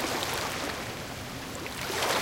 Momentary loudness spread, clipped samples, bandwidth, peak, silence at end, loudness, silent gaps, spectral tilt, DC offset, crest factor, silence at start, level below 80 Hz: 8 LU; under 0.1%; 17 kHz; -14 dBFS; 0 s; -32 LUFS; none; -2.5 dB/octave; under 0.1%; 20 dB; 0 s; -54 dBFS